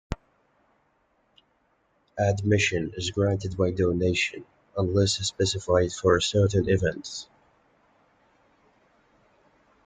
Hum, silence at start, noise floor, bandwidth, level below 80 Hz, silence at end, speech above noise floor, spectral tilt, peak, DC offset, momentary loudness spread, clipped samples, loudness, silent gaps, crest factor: none; 0.1 s; -69 dBFS; 9.4 kHz; -50 dBFS; 2.6 s; 44 dB; -5 dB/octave; -8 dBFS; under 0.1%; 14 LU; under 0.1%; -25 LUFS; none; 20 dB